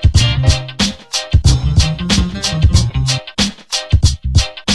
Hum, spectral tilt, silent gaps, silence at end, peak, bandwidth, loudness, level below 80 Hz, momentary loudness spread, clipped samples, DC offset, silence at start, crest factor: none; -4 dB/octave; none; 0 s; 0 dBFS; 12.5 kHz; -15 LUFS; -18 dBFS; 5 LU; under 0.1%; under 0.1%; 0 s; 12 dB